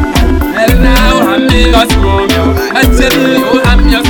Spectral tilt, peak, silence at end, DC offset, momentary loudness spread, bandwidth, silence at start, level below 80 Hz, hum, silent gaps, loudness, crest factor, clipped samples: -5 dB/octave; 0 dBFS; 0 s; under 0.1%; 3 LU; 19 kHz; 0 s; -12 dBFS; none; none; -8 LUFS; 8 dB; 3%